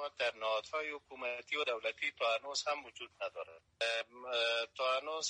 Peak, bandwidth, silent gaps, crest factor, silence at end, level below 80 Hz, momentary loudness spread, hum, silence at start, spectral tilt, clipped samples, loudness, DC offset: -24 dBFS; 10 kHz; none; 16 dB; 0 s; -82 dBFS; 9 LU; none; 0 s; 0.5 dB/octave; under 0.1%; -37 LUFS; under 0.1%